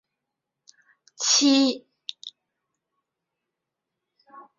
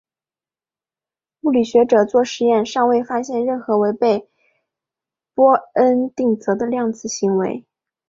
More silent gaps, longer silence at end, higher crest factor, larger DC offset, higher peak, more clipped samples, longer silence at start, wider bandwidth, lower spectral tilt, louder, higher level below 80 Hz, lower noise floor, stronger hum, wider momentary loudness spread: neither; second, 0.15 s vs 0.5 s; about the same, 20 dB vs 16 dB; neither; second, -8 dBFS vs -2 dBFS; neither; second, 1.2 s vs 1.45 s; about the same, 7.6 kHz vs 7.6 kHz; second, 0 dB/octave vs -5.5 dB/octave; about the same, -20 LUFS vs -18 LUFS; second, -76 dBFS vs -64 dBFS; second, -84 dBFS vs under -90 dBFS; neither; first, 24 LU vs 8 LU